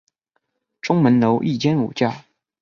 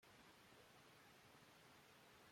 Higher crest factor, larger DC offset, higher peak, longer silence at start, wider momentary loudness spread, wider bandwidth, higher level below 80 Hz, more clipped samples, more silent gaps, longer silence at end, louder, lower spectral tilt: about the same, 16 dB vs 14 dB; neither; first, -4 dBFS vs -54 dBFS; first, 0.85 s vs 0 s; first, 11 LU vs 0 LU; second, 7.2 kHz vs 16 kHz; first, -60 dBFS vs -90 dBFS; neither; neither; first, 0.4 s vs 0 s; first, -19 LUFS vs -67 LUFS; first, -7.5 dB/octave vs -3 dB/octave